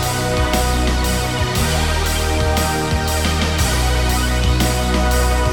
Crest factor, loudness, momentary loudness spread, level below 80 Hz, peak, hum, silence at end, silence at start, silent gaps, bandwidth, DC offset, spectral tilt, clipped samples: 12 dB; -17 LUFS; 2 LU; -20 dBFS; -4 dBFS; none; 0 s; 0 s; none; 19 kHz; under 0.1%; -4 dB/octave; under 0.1%